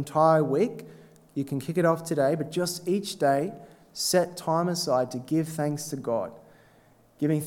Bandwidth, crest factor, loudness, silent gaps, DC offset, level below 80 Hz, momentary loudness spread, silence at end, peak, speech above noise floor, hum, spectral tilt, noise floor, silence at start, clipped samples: 18 kHz; 18 dB; -27 LUFS; none; under 0.1%; -70 dBFS; 11 LU; 0 s; -8 dBFS; 33 dB; none; -5 dB/octave; -59 dBFS; 0 s; under 0.1%